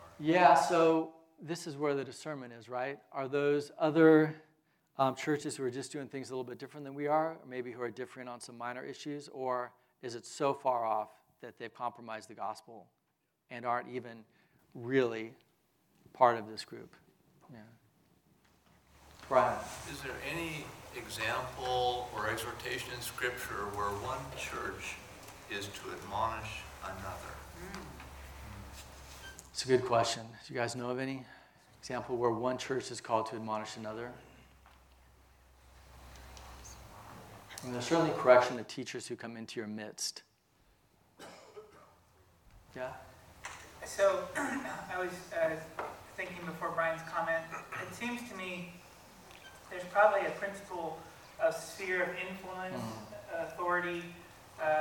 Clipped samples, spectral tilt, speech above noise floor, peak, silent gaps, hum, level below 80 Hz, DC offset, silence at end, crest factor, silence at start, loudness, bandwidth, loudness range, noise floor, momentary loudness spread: under 0.1%; -4.5 dB/octave; 46 dB; -10 dBFS; none; none; -62 dBFS; under 0.1%; 0 s; 26 dB; 0 s; -35 LUFS; 18 kHz; 11 LU; -80 dBFS; 21 LU